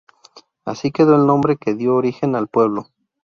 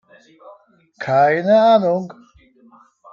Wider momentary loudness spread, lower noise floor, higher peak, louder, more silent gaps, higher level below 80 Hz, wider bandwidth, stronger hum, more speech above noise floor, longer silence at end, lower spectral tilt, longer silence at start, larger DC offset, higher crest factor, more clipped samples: second, 13 LU vs 16 LU; about the same, -49 dBFS vs -51 dBFS; about the same, -2 dBFS vs -4 dBFS; about the same, -17 LUFS vs -15 LUFS; neither; first, -58 dBFS vs -66 dBFS; about the same, 7 kHz vs 7 kHz; neither; second, 32 dB vs 36 dB; second, 0.4 s vs 1 s; about the same, -8 dB/octave vs -7 dB/octave; first, 0.65 s vs 0.45 s; neither; about the same, 16 dB vs 16 dB; neither